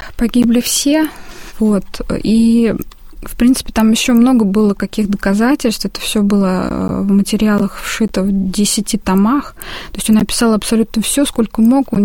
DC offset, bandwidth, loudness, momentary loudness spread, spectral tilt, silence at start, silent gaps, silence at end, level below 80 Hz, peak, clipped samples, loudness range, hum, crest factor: 0.5%; 17 kHz; -14 LUFS; 8 LU; -5 dB/octave; 0 s; none; 0 s; -32 dBFS; -2 dBFS; under 0.1%; 2 LU; none; 12 dB